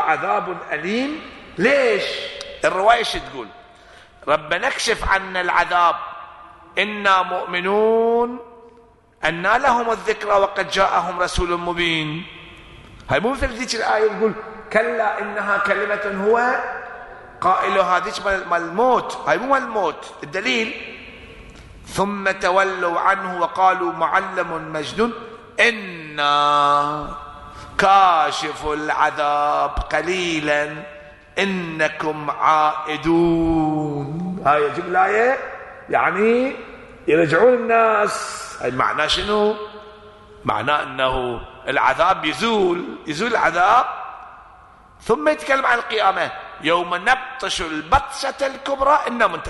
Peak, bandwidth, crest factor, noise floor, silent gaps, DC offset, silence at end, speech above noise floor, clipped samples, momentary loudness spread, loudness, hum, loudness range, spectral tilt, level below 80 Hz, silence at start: -2 dBFS; 11.5 kHz; 18 dB; -50 dBFS; none; under 0.1%; 0 s; 31 dB; under 0.1%; 13 LU; -19 LUFS; none; 3 LU; -4 dB/octave; -42 dBFS; 0 s